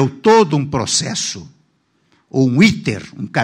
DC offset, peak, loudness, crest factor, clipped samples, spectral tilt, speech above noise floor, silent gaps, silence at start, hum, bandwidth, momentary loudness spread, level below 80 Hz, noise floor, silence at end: under 0.1%; 0 dBFS; -15 LUFS; 16 dB; under 0.1%; -4.5 dB/octave; 46 dB; none; 0 s; none; 11.5 kHz; 12 LU; -50 dBFS; -62 dBFS; 0 s